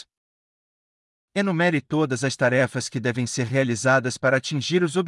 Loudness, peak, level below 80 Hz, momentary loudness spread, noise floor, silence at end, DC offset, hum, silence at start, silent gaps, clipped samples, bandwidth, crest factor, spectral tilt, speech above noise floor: -23 LUFS; -8 dBFS; -70 dBFS; 5 LU; under -90 dBFS; 0 s; under 0.1%; none; 1.35 s; none; under 0.1%; 12 kHz; 16 dB; -5 dB/octave; over 68 dB